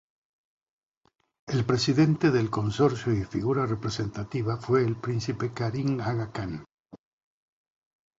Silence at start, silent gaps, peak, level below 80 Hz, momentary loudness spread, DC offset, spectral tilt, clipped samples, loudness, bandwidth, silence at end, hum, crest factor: 1.45 s; 6.74-6.84 s; -10 dBFS; -54 dBFS; 9 LU; under 0.1%; -6.5 dB/octave; under 0.1%; -27 LUFS; 8 kHz; 1.25 s; none; 18 dB